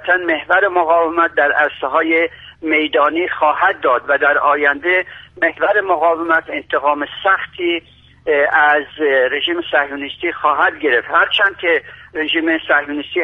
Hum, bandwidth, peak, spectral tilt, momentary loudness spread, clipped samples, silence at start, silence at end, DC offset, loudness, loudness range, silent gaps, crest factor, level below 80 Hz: none; 5.4 kHz; 0 dBFS; -5.5 dB/octave; 7 LU; under 0.1%; 0 s; 0 s; under 0.1%; -15 LUFS; 1 LU; none; 16 dB; -54 dBFS